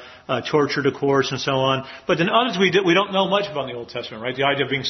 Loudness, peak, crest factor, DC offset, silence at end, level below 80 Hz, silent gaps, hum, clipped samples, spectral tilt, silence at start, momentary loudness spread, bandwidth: -20 LUFS; -2 dBFS; 20 dB; under 0.1%; 0 s; -60 dBFS; none; none; under 0.1%; -5 dB/octave; 0 s; 11 LU; 6.4 kHz